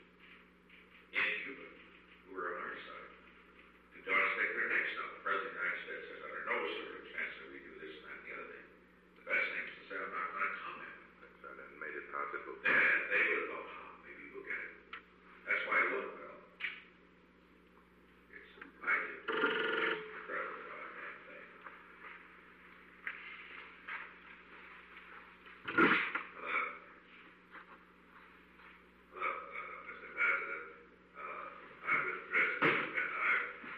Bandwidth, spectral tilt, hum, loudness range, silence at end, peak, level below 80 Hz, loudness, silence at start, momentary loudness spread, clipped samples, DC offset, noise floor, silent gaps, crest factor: 13 kHz; -5.5 dB/octave; 60 Hz at -70 dBFS; 12 LU; 0 s; -16 dBFS; -76 dBFS; -36 LUFS; 0 s; 23 LU; under 0.1%; under 0.1%; -64 dBFS; none; 24 dB